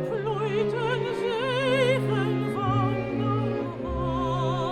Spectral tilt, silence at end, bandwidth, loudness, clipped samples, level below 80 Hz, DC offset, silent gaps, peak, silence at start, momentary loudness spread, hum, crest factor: -7 dB/octave; 0 s; 12 kHz; -26 LUFS; under 0.1%; -44 dBFS; under 0.1%; none; -12 dBFS; 0 s; 6 LU; none; 14 dB